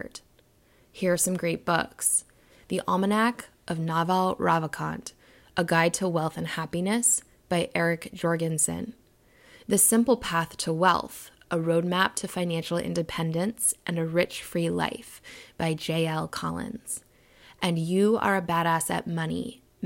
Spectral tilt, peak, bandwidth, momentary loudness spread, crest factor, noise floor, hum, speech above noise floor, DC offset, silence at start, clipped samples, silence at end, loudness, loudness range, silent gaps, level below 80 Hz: -4 dB/octave; -8 dBFS; 16.5 kHz; 12 LU; 20 dB; -61 dBFS; none; 35 dB; under 0.1%; 0 s; under 0.1%; 0 s; -26 LUFS; 4 LU; none; -60 dBFS